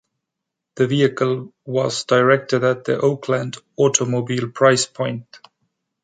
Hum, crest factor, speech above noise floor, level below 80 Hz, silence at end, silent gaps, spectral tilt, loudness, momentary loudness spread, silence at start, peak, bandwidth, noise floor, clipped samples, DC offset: none; 18 dB; 63 dB; -64 dBFS; 0.65 s; none; -4.5 dB/octave; -19 LUFS; 10 LU; 0.75 s; -2 dBFS; 9.4 kHz; -82 dBFS; under 0.1%; under 0.1%